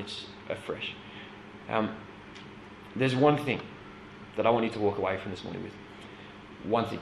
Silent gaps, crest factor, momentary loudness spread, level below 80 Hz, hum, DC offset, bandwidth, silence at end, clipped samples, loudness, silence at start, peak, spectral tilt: none; 22 dB; 21 LU; -60 dBFS; none; under 0.1%; 12.5 kHz; 0 s; under 0.1%; -30 LUFS; 0 s; -10 dBFS; -6.5 dB/octave